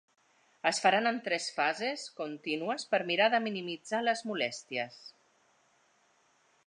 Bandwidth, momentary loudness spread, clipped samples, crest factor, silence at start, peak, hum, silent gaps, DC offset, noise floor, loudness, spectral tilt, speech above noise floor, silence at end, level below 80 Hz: 10.5 kHz; 12 LU; under 0.1%; 22 dB; 0.65 s; -12 dBFS; none; none; under 0.1%; -69 dBFS; -31 LUFS; -3 dB/octave; 38 dB; 1.55 s; -88 dBFS